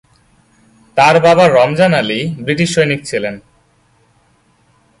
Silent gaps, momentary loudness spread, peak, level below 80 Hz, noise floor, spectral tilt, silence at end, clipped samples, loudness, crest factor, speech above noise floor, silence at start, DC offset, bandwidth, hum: none; 12 LU; 0 dBFS; -52 dBFS; -54 dBFS; -5 dB/octave; 1.6 s; under 0.1%; -12 LUFS; 14 dB; 43 dB; 0.95 s; under 0.1%; 11.5 kHz; none